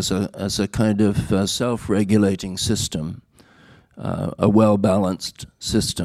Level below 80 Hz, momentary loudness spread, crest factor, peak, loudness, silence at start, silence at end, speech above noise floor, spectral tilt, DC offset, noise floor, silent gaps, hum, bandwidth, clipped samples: -44 dBFS; 13 LU; 18 dB; -2 dBFS; -20 LUFS; 0 s; 0 s; 31 dB; -5.5 dB/octave; under 0.1%; -51 dBFS; none; none; 15 kHz; under 0.1%